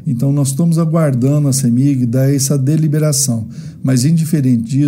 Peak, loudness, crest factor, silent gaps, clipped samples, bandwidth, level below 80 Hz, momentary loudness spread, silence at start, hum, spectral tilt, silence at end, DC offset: -2 dBFS; -14 LUFS; 12 dB; none; under 0.1%; 16.5 kHz; -54 dBFS; 3 LU; 0 s; none; -6 dB/octave; 0 s; under 0.1%